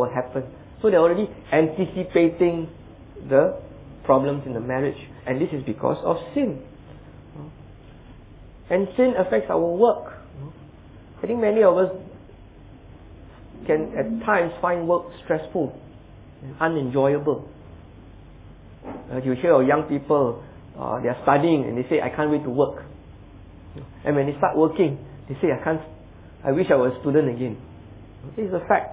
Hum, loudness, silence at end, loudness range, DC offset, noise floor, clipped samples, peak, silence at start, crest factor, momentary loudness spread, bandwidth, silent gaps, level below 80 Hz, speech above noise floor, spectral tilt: none; -22 LUFS; 0 s; 5 LU; under 0.1%; -45 dBFS; under 0.1%; -4 dBFS; 0 s; 20 dB; 22 LU; 4 kHz; none; -50 dBFS; 23 dB; -11 dB/octave